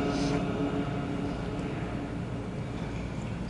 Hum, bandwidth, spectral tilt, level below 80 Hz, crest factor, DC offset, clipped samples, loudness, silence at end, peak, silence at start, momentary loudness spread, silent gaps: none; 11.5 kHz; -7 dB/octave; -44 dBFS; 14 dB; under 0.1%; under 0.1%; -33 LUFS; 0 s; -18 dBFS; 0 s; 6 LU; none